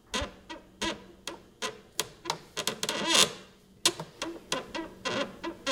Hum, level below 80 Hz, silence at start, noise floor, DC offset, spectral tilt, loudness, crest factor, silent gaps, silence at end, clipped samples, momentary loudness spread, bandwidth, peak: none; -56 dBFS; 0.1 s; -53 dBFS; under 0.1%; -1 dB/octave; -31 LUFS; 28 dB; none; 0 s; under 0.1%; 18 LU; 18 kHz; -6 dBFS